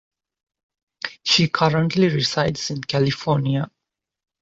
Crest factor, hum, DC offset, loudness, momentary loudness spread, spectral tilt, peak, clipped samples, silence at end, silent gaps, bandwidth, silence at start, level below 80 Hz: 20 dB; none; under 0.1%; -20 LUFS; 10 LU; -5 dB/octave; -4 dBFS; under 0.1%; 0.75 s; none; 8 kHz; 1.05 s; -54 dBFS